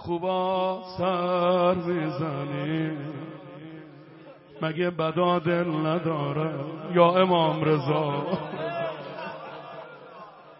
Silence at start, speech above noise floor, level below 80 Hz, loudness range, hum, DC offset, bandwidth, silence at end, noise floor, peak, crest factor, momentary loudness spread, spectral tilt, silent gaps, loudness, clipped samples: 0 s; 23 dB; -66 dBFS; 6 LU; none; under 0.1%; 5.8 kHz; 0.05 s; -48 dBFS; -6 dBFS; 22 dB; 20 LU; -11 dB/octave; none; -26 LUFS; under 0.1%